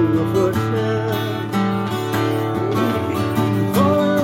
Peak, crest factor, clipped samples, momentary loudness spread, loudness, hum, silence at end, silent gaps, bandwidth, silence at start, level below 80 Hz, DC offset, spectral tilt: -4 dBFS; 14 dB; under 0.1%; 5 LU; -19 LUFS; none; 0 s; none; 17 kHz; 0 s; -52 dBFS; under 0.1%; -7 dB/octave